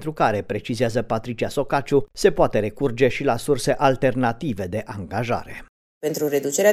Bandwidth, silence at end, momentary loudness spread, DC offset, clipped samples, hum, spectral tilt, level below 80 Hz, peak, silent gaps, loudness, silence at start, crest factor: 15.5 kHz; 0 s; 9 LU; under 0.1%; under 0.1%; none; -5 dB/octave; -44 dBFS; -4 dBFS; 5.69-6.01 s; -22 LUFS; 0 s; 18 dB